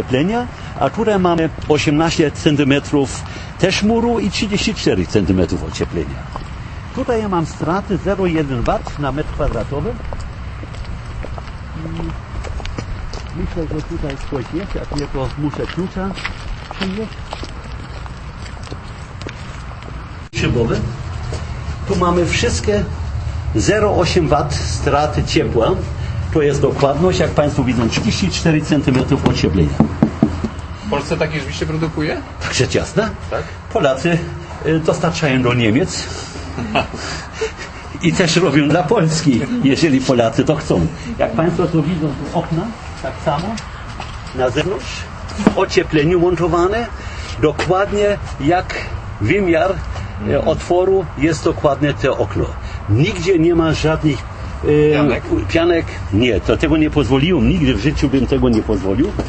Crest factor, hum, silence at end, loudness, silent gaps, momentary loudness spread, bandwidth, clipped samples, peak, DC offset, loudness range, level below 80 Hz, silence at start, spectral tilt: 16 dB; none; 0 s; -17 LUFS; none; 14 LU; 8.8 kHz; under 0.1%; 0 dBFS; under 0.1%; 9 LU; -30 dBFS; 0 s; -6 dB/octave